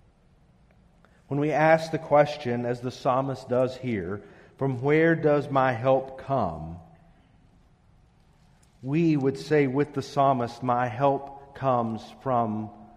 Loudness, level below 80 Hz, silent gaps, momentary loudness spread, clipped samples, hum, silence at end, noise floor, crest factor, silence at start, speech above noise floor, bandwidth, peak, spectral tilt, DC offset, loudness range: -25 LUFS; -58 dBFS; none; 11 LU; under 0.1%; none; 0.1 s; -59 dBFS; 20 dB; 1.3 s; 35 dB; 12 kHz; -6 dBFS; -7.5 dB/octave; under 0.1%; 5 LU